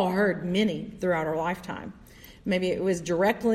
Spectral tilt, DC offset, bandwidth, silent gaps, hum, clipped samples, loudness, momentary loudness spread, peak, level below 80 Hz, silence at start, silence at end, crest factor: -6 dB/octave; under 0.1%; 14 kHz; none; none; under 0.1%; -27 LUFS; 13 LU; -12 dBFS; -54 dBFS; 0 s; 0 s; 14 dB